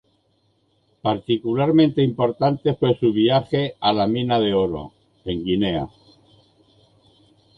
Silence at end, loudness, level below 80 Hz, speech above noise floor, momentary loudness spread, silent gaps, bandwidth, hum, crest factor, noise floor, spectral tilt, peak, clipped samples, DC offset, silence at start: 1.7 s; -20 LUFS; -50 dBFS; 45 dB; 11 LU; none; 5.2 kHz; none; 16 dB; -65 dBFS; -9 dB/octave; -6 dBFS; under 0.1%; under 0.1%; 1.05 s